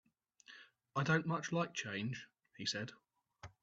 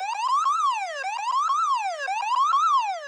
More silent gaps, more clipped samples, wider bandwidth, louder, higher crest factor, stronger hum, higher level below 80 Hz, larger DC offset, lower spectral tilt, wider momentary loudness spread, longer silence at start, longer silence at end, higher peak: neither; neither; second, 8 kHz vs 11 kHz; second, -39 LUFS vs -23 LUFS; first, 22 dB vs 10 dB; neither; first, -76 dBFS vs under -90 dBFS; neither; first, -4.5 dB/octave vs 8 dB/octave; first, 24 LU vs 7 LU; first, 0.5 s vs 0 s; first, 0.15 s vs 0 s; second, -20 dBFS vs -14 dBFS